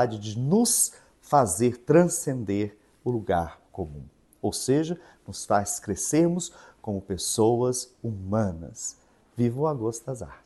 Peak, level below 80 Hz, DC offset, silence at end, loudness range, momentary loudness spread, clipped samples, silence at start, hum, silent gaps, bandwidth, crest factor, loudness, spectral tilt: -6 dBFS; -54 dBFS; under 0.1%; 0.1 s; 5 LU; 16 LU; under 0.1%; 0 s; none; none; 12.5 kHz; 20 dB; -26 LUFS; -5 dB/octave